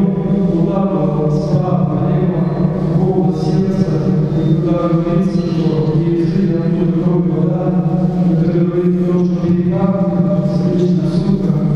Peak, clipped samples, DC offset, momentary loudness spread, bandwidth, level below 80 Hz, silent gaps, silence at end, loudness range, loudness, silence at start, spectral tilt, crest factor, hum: -2 dBFS; under 0.1%; under 0.1%; 1 LU; 6.6 kHz; -36 dBFS; none; 0 s; 1 LU; -15 LUFS; 0 s; -10 dB/octave; 12 dB; none